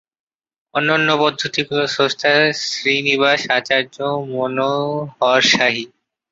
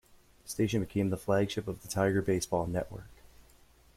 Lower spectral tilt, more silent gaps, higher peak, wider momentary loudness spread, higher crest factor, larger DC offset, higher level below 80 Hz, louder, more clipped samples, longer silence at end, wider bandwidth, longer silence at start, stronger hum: second, -3.5 dB/octave vs -5.5 dB/octave; neither; first, -2 dBFS vs -14 dBFS; second, 8 LU vs 12 LU; about the same, 16 dB vs 18 dB; neither; second, -62 dBFS vs -56 dBFS; first, -17 LUFS vs -32 LUFS; neither; second, 0.45 s vs 0.85 s; second, 8 kHz vs 16 kHz; first, 0.75 s vs 0.45 s; neither